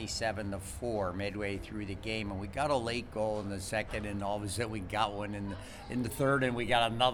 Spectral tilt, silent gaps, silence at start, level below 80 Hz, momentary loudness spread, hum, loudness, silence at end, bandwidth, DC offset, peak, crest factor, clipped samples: -4.5 dB/octave; none; 0 s; -50 dBFS; 10 LU; none; -34 LUFS; 0 s; 19.5 kHz; under 0.1%; -12 dBFS; 22 dB; under 0.1%